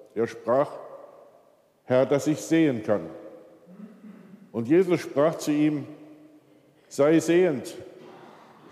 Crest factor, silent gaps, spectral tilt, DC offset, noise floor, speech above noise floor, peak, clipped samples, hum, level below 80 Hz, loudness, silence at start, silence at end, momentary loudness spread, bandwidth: 16 dB; none; -6 dB/octave; under 0.1%; -60 dBFS; 37 dB; -10 dBFS; under 0.1%; none; -78 dBFS; -24 LUFS; 0.15 s; 0.55 s; 22 LU; 14.5 kHz